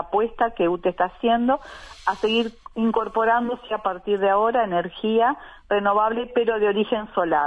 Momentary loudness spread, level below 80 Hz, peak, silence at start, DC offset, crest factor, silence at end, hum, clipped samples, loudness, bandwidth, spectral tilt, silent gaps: 7 LU; -52 dBFS; -8 dBFS; 0 s; under 0.1%; 14 dB; 0 s; none; under 0.1%; -22 LUFS; 10 kHz; -6 dB/octave; none